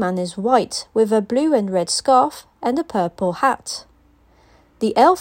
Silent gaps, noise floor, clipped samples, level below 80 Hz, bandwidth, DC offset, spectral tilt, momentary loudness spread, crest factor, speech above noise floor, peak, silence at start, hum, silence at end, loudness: none; -54 dBFS; under 0.1%; -56 dBFS; 16.5 kHz; under 0.1%; -4.5 dB/octave; 9 LU; 18 dB; 36 dB; -2 dBFS; 0 s; none; 0 s; -19 LUFS